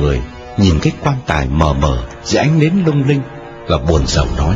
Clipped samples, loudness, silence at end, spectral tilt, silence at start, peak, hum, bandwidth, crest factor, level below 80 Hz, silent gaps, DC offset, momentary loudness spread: under 0.1%; -15 LUFS; 0 s; -6 dB/octave; 0 s; 0 dBFS; none; 7.8 kHz; 14 dB; -22 dBFS; none; under 0.1%; 9 LU